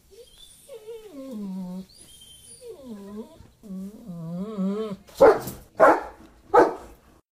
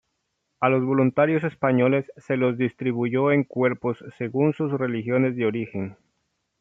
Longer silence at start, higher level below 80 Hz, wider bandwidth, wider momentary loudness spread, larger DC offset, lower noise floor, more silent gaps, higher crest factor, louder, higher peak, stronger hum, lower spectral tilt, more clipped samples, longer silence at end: second, 0.2 s vs 0.6 s; first, -56 dBFS vs -68 dBFS; first, 15.5 kHz vs 3.8 kHz; first, 26 LU vs 9 LU; neither; second, -50 dBFS vs -76 dBFS; neither; about the same, 22 dB vs 18 dB; about the same, -22 LUFS vs -23 LUFS; about the same, -4 dBFS vs -4 dBFS; neither; second, -6 dB/octave vs -9.5 dB/octave; neither; second, 0.5 s vs 0.7 s